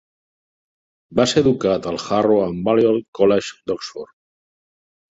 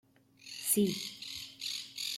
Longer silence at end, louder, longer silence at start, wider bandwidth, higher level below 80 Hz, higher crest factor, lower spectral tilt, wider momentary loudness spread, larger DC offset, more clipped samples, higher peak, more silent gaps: first, 1.1 s vs 0 s; first, -19 LUFS vs -34 LUFS; first, 1.1 s vs 0.4 s; second, 8 kHz vs 16 kHz; first, -52 dBFS vs -76 dBFS; about the same, 18 dB vs 22 dB; first, -5.5 dB/octave vs -3 dB/octave; second, 11 LU vs 15 LU; neither; neither; first, -2 dBFS vs -14 dBFS; first, 3.08-3.13 s vs none